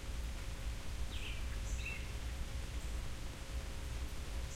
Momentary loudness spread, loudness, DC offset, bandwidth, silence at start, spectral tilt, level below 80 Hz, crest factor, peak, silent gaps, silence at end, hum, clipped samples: 3 LU; -45 LUFS; under 0.1%; 16 kHz; 0 s; -4 dB/octave; -42 dBFS; 12 dB; -28 dBFS; none; 0 s; none; under 0.1%